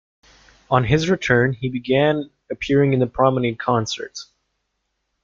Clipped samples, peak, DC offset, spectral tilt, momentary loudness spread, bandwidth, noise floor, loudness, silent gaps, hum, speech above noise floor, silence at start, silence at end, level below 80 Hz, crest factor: under 0.1%; -2 dBFS; under 0.1%; -6 dB/octave; 12 LU; 7.6 kHz; -74 dBFS; -19 LUFS; none; none; 55 dB; 0.7 s; 1 s; -46 dBFS; 18 dB